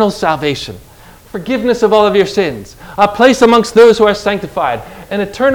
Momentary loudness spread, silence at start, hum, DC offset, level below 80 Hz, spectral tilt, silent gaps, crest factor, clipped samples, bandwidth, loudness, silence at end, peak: 16 LU; 0 s; none; under 0.1%; -42 dBFS; -5 dB/octave; none; 12 dB; 1%; 18 kHz; -11 LUFS; 0 s; 0 dBFS